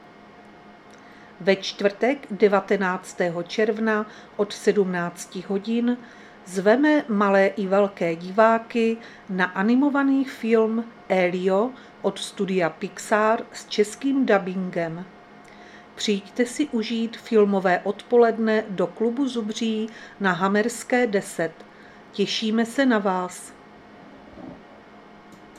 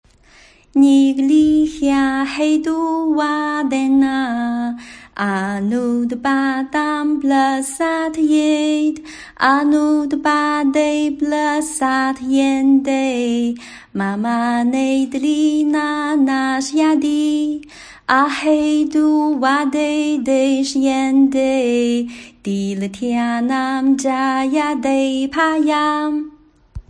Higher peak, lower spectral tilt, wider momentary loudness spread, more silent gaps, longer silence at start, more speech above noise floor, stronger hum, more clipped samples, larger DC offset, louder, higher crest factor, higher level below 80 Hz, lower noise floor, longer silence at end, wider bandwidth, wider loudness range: second, -4 dBFS vs 0 dBFS; about the same, -5 dB/octave vs -4.5 dB/octave; first, 11 LU vs 7 LU; neither; second, 0.4 s vs 0.75 s; second, 24 dB vs 32 dB; neither; neither; neither; second, -23 LUFS vs -17 LUFS; about the same, 20 dB vs 16 dB; second, -68 dBFS vs -50 dBFS; about the same, -47 dBFS vs -48 dBFS; about the same, 0.15 s vs 0.1 s; first, 14 kHz vs 10.5 kHz; about the same, 4 LU vs 3 LU